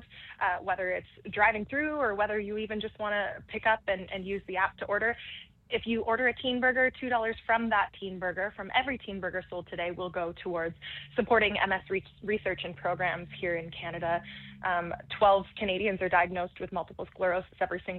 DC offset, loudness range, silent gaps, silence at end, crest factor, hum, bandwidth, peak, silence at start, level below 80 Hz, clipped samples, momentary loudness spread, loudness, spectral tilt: under 0.1%; 3 LU; none; 0 s; 20 dB; none; 4.4 kHz; -10 dBFS; 0 s; -58 dBFS; under 0.1%; 10 LU; -30 LUFS; -7.5 dB/octave